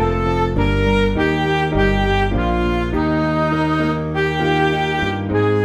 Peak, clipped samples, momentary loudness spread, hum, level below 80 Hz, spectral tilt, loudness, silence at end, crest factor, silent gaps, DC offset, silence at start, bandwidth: -4 dBFS; under 0.1%; 3 LU; none; -26 dBFS; -7 dB/octave; -18 LUFS; 0 s; 12 dB; none; 0.1%; 0 s; 11.5 kHz